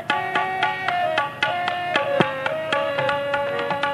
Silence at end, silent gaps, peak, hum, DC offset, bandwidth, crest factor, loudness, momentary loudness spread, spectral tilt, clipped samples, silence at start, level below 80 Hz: 0 s; none; -2 dBFS; 50 Hz at -50 dBFS; under 0.1%; 14.5 kHz; 20 dB; -22 LUFS; 2 LU; -4.5 dB/octave; under 0.1%; 0 s; -62 dBFS